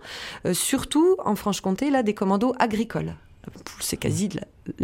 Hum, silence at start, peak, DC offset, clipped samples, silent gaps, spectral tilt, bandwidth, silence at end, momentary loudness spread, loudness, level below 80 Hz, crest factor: none; 0 s; -6 dBFS; under 0.1%; under 0.1%; none; -4.5 dB/octave; 16.5 kHz; 0 s; 16 LU; -24 LUFS; -50 dBFS; 18 dB